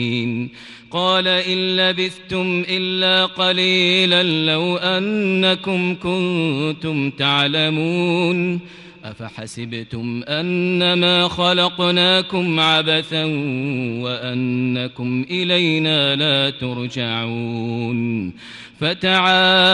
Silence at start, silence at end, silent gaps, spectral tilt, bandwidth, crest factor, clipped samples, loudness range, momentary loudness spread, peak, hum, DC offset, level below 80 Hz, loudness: 0 s; 0 s; none; -5.5 dB/octave; 11.5 kHz; 14 dB; under 0.1%; 4 LU; 12 LU; -4 dBFS; none; under 0.1%; -56 dBFS; -17 LUFS